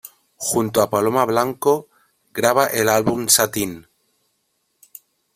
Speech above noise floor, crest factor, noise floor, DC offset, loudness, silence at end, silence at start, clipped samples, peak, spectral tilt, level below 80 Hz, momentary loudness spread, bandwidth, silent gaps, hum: 51 dB; 20 dB; -70 dBFS; under 0.1%; -18 LUFS; 1.55 s; 0.05 s; under 0.1%; 0 dBFS; -3 dB/octave; -58 dBFS; 11 LU; 16 kHz; none; none